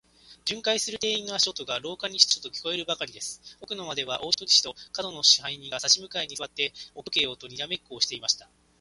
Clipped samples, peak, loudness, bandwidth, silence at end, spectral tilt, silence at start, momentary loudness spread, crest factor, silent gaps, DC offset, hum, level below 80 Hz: under 0.1%; -2 dBFS; -25 LUFS; 11.5 kHz; 0.35 s; 0 dB/octave; 0.3 s; 14 LU; 26 dB; none; under 0.1%; none; -66 dBFS